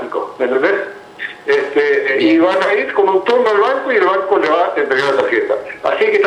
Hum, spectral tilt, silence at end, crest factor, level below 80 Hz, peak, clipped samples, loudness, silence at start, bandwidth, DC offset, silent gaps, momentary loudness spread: none; -4.5 dB/octave; 0 s; 14 dB; -62 dBFS; 0 dBFS; under 0.1%; -14 LUFS; 0 s; 10 kHz; under 0.1%; none; 8 LU